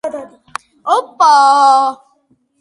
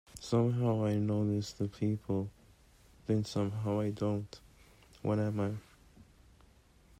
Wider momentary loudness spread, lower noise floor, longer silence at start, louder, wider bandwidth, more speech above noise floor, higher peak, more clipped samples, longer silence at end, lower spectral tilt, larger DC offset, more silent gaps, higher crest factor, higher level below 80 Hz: first, 22 LU vs 11 LU; second, -58 dBFS vs -63 dBFS; about the same, 0.05 s vs 0.15 s; first, -11 LUFS vs -34 LUFS; second, 11.5 kHz vs 13 kHz; first, 48 dB vs 30 dB; first, 0 dBFS vs -20 dBFS; neither; second, 0.65 s vs 0.95 s; second, -1 dB/octave vs -7.5 dB/octave; neither; neither; about the same, 14 dB vs 16 dB; second, -68 dBFS vs -62 dBFS